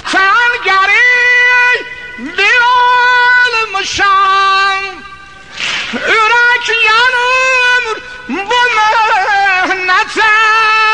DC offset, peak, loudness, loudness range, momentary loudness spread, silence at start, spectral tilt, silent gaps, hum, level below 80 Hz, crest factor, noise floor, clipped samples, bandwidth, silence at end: 0.7%; 0 dBFS; -8 LUFS; 3 LU; 12 LU; 0.05 s; -1 dB/octave; none; none; -46 dBFS; 10 dB; -32 dBFS; under 0.1%; 10.5 kHz; 0 s